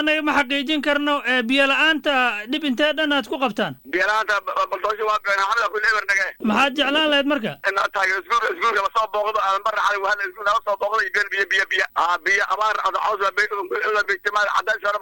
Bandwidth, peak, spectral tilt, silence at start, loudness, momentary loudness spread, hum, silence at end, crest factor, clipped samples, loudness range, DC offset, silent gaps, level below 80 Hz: 17 kHz; -6 dBFS; -3 dB/octave; 0 s; -20 LUFS; 5 LU; none; 0 s; 14 dB; under 0.1%; 2 LU; under 0.1%; none; -56 dBFS